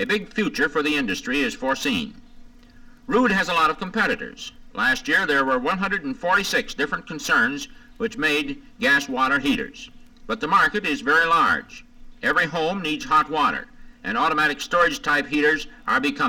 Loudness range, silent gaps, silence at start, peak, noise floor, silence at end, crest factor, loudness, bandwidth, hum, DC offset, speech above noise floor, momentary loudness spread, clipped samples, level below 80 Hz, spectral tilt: 3 LU; none; 0 s; -8 dBFS; -46 dBFS; 0 s; 14 dB; -21 LUFS; 19 kHz; none; under 0.1%; 24 dB; 10 LU; under 0.1%; -48 dBFS; -3.5 dB/octave